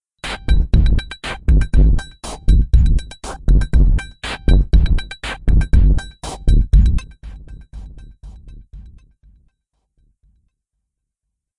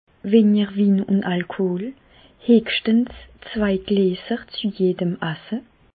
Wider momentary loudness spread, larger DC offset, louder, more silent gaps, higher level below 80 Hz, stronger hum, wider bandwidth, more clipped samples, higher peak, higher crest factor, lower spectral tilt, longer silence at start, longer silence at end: first, 18 LU vs 13 LU; neither; first, -18 LUFS vs -21 LUFS; neither; first, -16 dBFS vs -52 dBFS; neither; first, 11 kHz vs 4.8 kHz; neither; first, 0 dBFS vs -4 dBFS; about the same, 14 dB vs 18 dB; second, -6.5 dB/octave vs -11.5 dB/octave; about the same, 0.25 s vs 0.25 s; first, 2.75 s vs 0.4 s